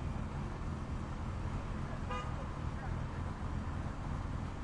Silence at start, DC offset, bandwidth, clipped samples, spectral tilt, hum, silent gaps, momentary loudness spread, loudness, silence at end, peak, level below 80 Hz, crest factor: 0 s; under 0.1%; 10.5 kHz; under 0.1%; -7 dB/octave; none; none; 1 LU; -41 LUFS; 0 s; -26 dBFS; -44 dBFS; 12 dB